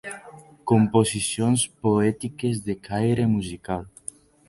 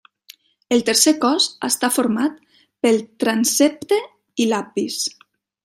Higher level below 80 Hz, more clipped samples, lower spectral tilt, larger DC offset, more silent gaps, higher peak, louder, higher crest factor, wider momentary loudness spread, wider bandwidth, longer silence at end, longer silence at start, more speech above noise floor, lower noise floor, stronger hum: first, -52 dBFS vs -68 dBFS; neither; first, -5.5 dB/octave vs -2.5 dB/octave; neither; neither; second, -6 dBFS vs 0 dBFS; second, -23 LUFS vs -19 LUFS; about the same, 18 dB vs 20 dB; first, 17 LU vs 9 LU; second, 11.5 kHz vs 16 kHz; about the same, 0.6 s vs 0.55 s; second, 0.05 s vs 0.7 s; second, 24 dB vs 31 dB; about the same, -46 dBFS vs -49 dBFS; neither